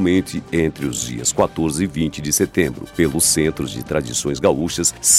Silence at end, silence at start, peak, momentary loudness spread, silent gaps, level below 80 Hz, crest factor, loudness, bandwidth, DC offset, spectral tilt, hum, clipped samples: 0 s; 0 s; -2 dBFS; 8 LU; none; -40 dBFS; 18 dB; -19 LUFS; 16.5 kHz; under 0.1%; -3.5 dB/octave; none; under 0.1%